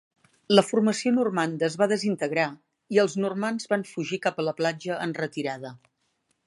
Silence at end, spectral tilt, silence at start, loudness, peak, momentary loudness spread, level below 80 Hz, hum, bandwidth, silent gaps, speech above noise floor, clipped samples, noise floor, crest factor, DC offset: 0.7 s; -5 dB/octave; 0.5 s; -26 LUFS; -2 dBFS; 9 LU; -76 dBFS; none; 11.5 kHz; none; 48 dB; under 0.1%; -73 dBFS; 24 dB; under 0.1%